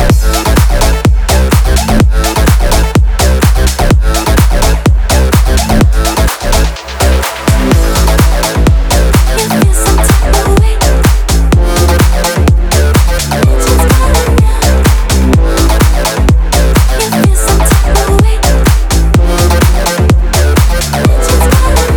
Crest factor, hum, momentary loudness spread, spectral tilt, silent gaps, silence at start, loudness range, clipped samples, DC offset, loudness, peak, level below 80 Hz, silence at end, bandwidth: 6 dB; none; 2 LU; -5 dB/octave; none; 0 s; 1 LU; 0.2%; under 0.1%; -9 LUFS; 0 dBFS; -8 dBFS; 0 s; over 20 kHz